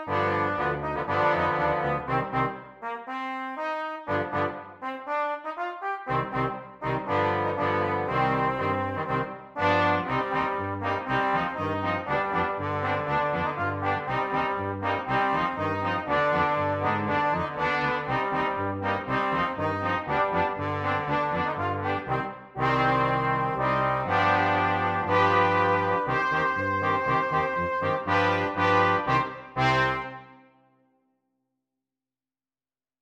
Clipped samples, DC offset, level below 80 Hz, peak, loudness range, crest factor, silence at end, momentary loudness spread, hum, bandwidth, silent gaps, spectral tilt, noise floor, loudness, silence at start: under 0.1%; under 0.1%; -54 dBFS; -8 dBFS; 6 LU; 18 dB; 2.7 s; 8 LU; none; 9.6 kHz; none; -7 dB/octave; under -90 dBFS; -26 LUFS; 0 s